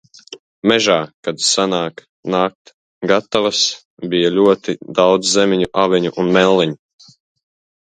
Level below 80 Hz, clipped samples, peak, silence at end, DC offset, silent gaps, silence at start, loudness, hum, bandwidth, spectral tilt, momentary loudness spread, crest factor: -56 dBFS; under 0.1%; 0 dBFS; 1.1 s; under 0.1%; 0.39-0.62 s, 1.14-1.23 s, 2.09-2.23 s, 2.55-2.65 s, 2.74-3.01 s, 3.85-3.97 s; 0.3 s; -16 LUFS; none; 9.4 kHz; -3.5 dB/octave; 9 LU; 16 dB